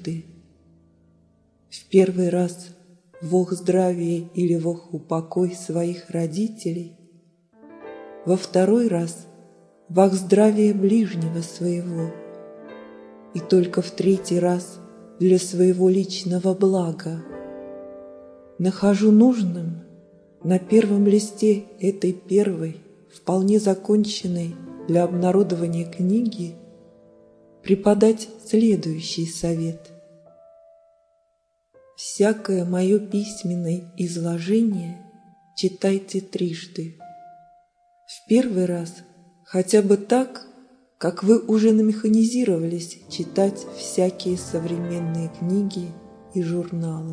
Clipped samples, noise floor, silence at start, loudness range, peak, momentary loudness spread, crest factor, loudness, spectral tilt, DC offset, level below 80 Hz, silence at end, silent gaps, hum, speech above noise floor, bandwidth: under 0.1%; -70 dBFS; 0 s; 6 LU; -2 dBFS; 18 LU; 20 dB; -22 LUFS; -6.5 dB/octave; under 0.1%; -62 dBFS; 0 s; none; none; 49 dB; 11 kHz